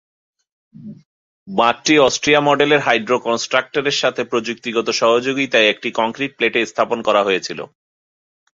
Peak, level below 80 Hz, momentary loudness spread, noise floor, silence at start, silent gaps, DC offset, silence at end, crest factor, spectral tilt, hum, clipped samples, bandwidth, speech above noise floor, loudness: 0 dBFS; -58 dBFS; 8 LU; under -90 dBFS; 0.8 s; 1.06-1.46 s; under 0.1%; 0.9 s; 18 dB; -3 dB/octave; none; under 0.1%; 7.8 kHz; over 73 dB; -16 LUFS